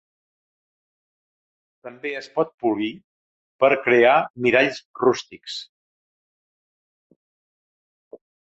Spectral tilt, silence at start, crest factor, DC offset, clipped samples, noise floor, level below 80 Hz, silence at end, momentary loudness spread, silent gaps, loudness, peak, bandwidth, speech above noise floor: -5 dB/octave; 1.85 s; 22 dB; under 0.1%; under 0.1%; under -90 dBFS; -68 dBFS; 2.85 s; 17 LU; 2.54-2.58 s, 3.04-3.59 s, 4.30-4.34 s, 4.85-4.94 s; -20 LUFS; -4 dBFS; 8 kHz; over 69 dB